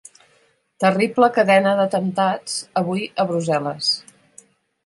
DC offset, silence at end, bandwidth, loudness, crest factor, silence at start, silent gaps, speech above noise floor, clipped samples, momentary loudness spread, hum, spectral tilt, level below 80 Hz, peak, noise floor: under 0.1%; 0.85 s; 11.5 kHz; -19 LUFS; 18 dB; 0.8 s; none; 42 dB; under 0.1%; 8 LU; none; -4.5 dB/octave; -68 dBFS; -2 dBFS; -60 dBFS